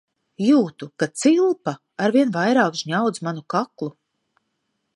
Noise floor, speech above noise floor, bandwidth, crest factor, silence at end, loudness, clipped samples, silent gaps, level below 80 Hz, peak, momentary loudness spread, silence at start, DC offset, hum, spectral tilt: -74 dBFS; 54 dB; 11.5 kHz; 18 dB; 1.05 s; -21 LUFS; under 0.1%; none; -74 dBFS; -4 dBFS; 12 LU; 0.4 s; under 0.1%; none; -5.5 dB/octave